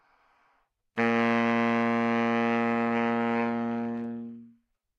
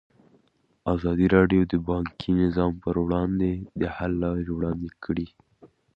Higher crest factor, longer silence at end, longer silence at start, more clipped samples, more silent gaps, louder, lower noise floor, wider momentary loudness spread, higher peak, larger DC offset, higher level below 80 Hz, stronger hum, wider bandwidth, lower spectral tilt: second, 16 dB vs 22 dB; first, 0.5 s vs 0.3 s; about the same, 0.95 s vs 0.85 s; neither; neither; about the same, -27 LUFS vs -25 LUFS; first, -71 dBFS vs -66 dBFS; about the same, 11 LU vs 11 LU; second, -12 dBFS vs -4 dBFS; neither; second, -70 dBFS vs -42 dBFS; neither; first, 6.8 kHz vs 5.6 kHz; second, -7 dB/octave vs -10 dB/octave